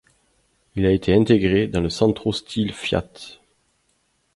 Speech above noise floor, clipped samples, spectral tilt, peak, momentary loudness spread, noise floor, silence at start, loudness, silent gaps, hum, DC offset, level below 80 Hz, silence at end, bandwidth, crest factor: 47 dB; under 0.1%; -6.5 dB/octave; -2 dBFS; 17 LU; -67 dBFS; 0.75 s; -20 LUFS; none; none; under 0.1%; -42 dBFS; 1 s; 11.5 kHz; 20 dB